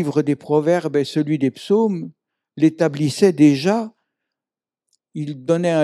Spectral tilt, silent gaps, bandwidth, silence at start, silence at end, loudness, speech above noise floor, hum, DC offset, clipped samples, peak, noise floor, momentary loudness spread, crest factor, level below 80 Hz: -6.5 dB/octave; none; 12.5 kHz; 0 s; 0 s; -19 LUFS; 72 dB; none; under 0.1%; under 0.1%; -2 dBFS; -90 dBFS; 15 LU; 16 dB; -74 dBFS